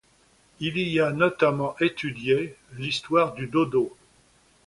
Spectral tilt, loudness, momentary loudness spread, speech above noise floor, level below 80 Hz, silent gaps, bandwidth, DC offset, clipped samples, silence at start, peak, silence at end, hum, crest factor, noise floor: -6 dB/octave; -25 LUFS; 9 LU; 36 dB; -60 dBFS; none; 11.5 kHz; under 0.1%; under 0.1%; 0.6 s; -6 dBFS; 0.8 s; none; 20 dB; -61 dBFS